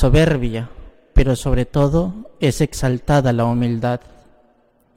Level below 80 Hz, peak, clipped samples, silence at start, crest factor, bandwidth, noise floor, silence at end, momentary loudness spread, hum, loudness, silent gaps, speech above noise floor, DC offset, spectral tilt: -26 dBFS; -4 dBFS; under 0.1%; 0 s; 14 dB; 15.5 kHz; -57 dBFS; 1 s; 10 LU; none; -19 LUFS; none; 41 dB; under 0.1%; -7 dB/octave